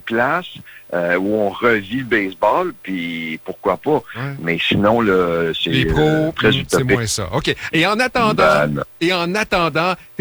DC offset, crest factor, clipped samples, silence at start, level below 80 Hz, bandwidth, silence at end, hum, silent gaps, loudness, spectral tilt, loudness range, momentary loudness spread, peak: under 0.1%; 14 dB; under 0.1%; 0.05 s; -40 dBFS; over 20 kHz; 0.15 s; none; none; -17 LUFS; -5 dB/octave; 3 LU; 9 LU; -4 dBFS